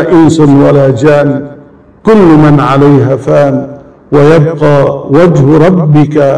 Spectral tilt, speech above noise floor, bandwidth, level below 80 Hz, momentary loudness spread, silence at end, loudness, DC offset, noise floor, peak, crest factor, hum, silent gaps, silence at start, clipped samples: -8.5 dB/octave; 30 dB; 10 kHz; -34 dBFS; 7 LU; 0 s; -6 LUFS; 3%; -34 dBFS; 0 dBFS; 6 dB; none; none; 0 s; 20%